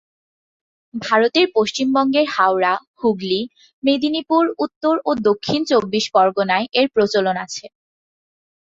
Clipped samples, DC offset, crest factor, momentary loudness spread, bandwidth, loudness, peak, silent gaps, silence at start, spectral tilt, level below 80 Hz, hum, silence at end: under 0.1%; under 0.1%; 16 dB; 7 LU; 7.8 kHz; -18 LUFS; -2 dBFS; 2.87-2.94 s, 3.73-3.82 s, 4.76-4.81 s; 0.95 s; -4.5 dB/octave; -62 dBFS; none; 1 s